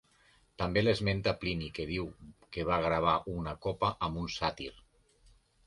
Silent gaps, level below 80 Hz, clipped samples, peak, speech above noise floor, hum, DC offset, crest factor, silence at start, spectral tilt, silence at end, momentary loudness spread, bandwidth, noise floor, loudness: none; -50 dBFS; under 0.1%; -14 dBFS; 34 dB; none; under 0.1%; 20 dB; 0.6 s; -6 dB/octave; 0.95 s; 10 LU; 11.5 kHz; -66 dBFS; -33 LUFS